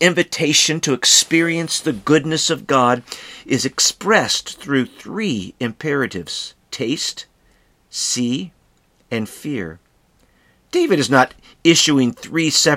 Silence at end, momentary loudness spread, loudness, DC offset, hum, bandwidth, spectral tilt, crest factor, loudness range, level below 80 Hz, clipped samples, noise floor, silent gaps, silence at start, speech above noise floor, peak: 0 s; 13 LU; -17 LUFS; under 0.1%; none; 16.5 kHz; -3 dB/octave; 18 dB; 9 LU; -58 dBFS; under 0.1%; -58 dBFS; none; 0 s; 40 dB; 0 dBFS